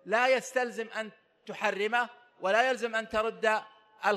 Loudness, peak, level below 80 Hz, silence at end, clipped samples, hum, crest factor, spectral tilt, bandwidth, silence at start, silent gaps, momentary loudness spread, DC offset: -30 LUFS; -12 dBFS; -68 dBFS; 0 s; under 0.1%; none; 18 dB; -2.5 dB/octave; 14 kHz; 0.05 s; none; 11 LU; under 0.1%